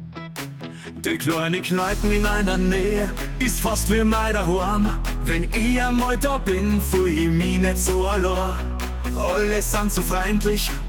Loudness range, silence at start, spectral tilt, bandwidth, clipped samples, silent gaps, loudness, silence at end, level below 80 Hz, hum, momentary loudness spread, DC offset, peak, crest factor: 1 LU; 0 s; -5 dB/octave; 18 kHz; under 0.1%; none; -22 LUFS; 0 s; -26 dBFS; none; 7 LU; under 0.1%; -8 dBFS; 14 dB